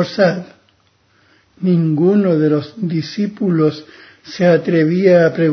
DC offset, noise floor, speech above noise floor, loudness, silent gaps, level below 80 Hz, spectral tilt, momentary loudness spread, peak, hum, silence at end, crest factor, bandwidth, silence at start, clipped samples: under 0.1%; -57 dBFS; 43 dB; -15 LUFS; none; -64 dBFS; -8 dB/octave; 10 LU; 0 dBFS; none; 0 s; 14 dB; 6.4 kHz; 0 s; under 0.1%